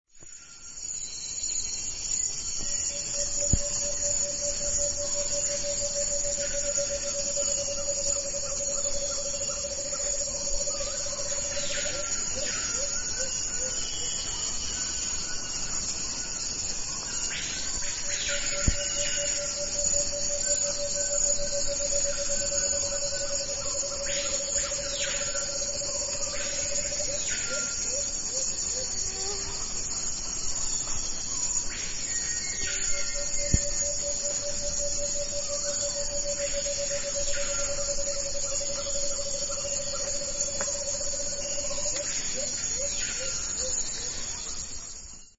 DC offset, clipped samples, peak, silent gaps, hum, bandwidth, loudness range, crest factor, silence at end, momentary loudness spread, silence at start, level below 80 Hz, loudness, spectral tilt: under 0.1%; under 0.1%; -8 dBFS; none; none; 8.2 kHz; 3 LU; 22 dB; 0.1 s; 4 LU; 0.15 s; -42 dBFS; -28 LUFS; -0.5 dB/octave